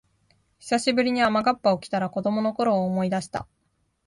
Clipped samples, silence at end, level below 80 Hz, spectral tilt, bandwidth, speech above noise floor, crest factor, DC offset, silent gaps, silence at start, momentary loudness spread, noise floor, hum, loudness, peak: under 0.1%; 0.65 s; -62 dBFS; -5.5 dB/octave; 11.5 kHz; 48 dB; 16 dB; under 0.1%; none; 0.65 s; 8 LU; -71 dBFS; none; -24 LUFS; -8 dBFS